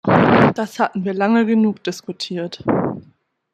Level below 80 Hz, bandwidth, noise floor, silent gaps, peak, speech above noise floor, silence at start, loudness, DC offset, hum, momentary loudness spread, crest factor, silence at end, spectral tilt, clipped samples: -54 dBFS; 12 kHz; -54 dBFS; none; -2 dBFS; 35 dB; 0.05 s; -18 LUFS; under 0.1%; none; 13 LU; 16 dB; 0.55 s; -6.5 dB/octave; under 0.1%